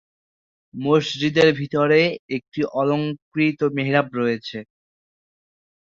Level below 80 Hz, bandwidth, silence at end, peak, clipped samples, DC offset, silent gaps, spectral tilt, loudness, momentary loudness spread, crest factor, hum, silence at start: -62 dBFS; 7.6 kHz; 1.2 s; -2 dBFS; under 0.1%; under 0.1%; 2.19-2.29 s, 2.48-2.52 s, 3.22-3.32 s; -6.5 dB/octave; -21 LUFS; 12 LU; 20 dB; none; 0.75 s